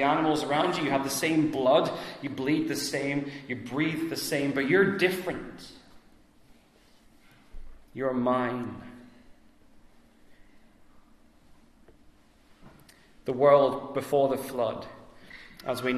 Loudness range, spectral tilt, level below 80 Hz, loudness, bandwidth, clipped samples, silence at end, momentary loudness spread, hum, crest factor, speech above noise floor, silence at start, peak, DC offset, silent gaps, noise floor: 8 LU; -5 dB/octave; -60 dBFS; -27 LUFS; 14 kHz; under 0.1%; 0 s; 19 LU; none; 22 dB; 33 dB; 0 s; -8 dBFS; under 0.1%; none; -59 dBFS